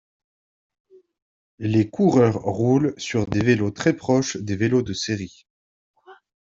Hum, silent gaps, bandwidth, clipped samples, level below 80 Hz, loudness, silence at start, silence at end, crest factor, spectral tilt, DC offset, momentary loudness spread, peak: none; 5.50-5.94 s; 7.8 kHz; under 0.1%; -54 dBFS; -21 LUFS; 1.6 s; 0.3 s; 20 dB; -6 dB/octave; under 0.1%; 8 LU; -4 dBFS